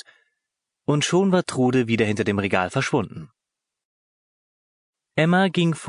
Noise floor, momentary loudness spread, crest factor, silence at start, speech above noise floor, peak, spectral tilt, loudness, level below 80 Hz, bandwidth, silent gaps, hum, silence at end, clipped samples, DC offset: -85 dBFS; 10 LU; 18 dB; 0.9 s; 65 dB; -4 dBFS; -5.5 dB/octave; -21 LUFS; -56 dBFS; 11 kHz; 3.85-4.93 s; none; 0 s; under 0.1%; under 0.1%